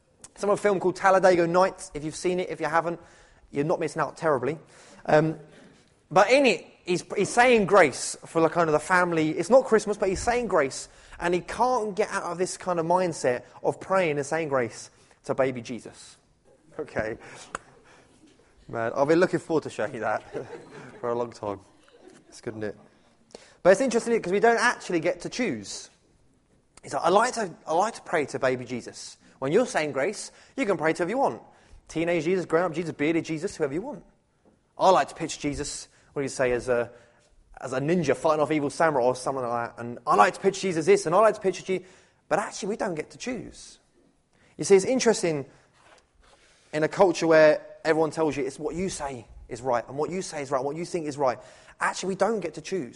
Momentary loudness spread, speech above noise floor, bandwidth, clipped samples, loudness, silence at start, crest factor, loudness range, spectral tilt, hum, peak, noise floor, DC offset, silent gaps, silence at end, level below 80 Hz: 17 LU; 39 dB; 11.5 kHz; under 0.1%; -25 LUFS; 0.4 s; 22 dB; 7 LU; -4.5 dB/octave; none; -4 dBFS; -64 dBFS; under 0.1%; none; 0.05 s; -56 dBFS